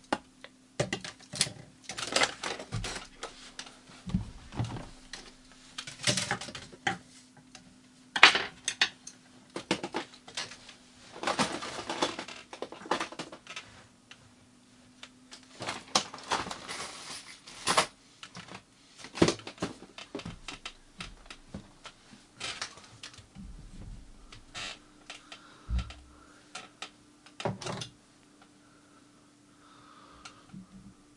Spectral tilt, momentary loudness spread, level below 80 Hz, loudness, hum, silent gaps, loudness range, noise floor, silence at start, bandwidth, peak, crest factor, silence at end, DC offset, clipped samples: -2.5 dB/octave; 23 LU; -52 dBFS; -32 LUFS; none; none; 16 LU; -60 dBFS; 0.1 s; 11.5 kHz; 0 dBFS; 36 dB; 0.25 s; under 0.1%; under 0.1%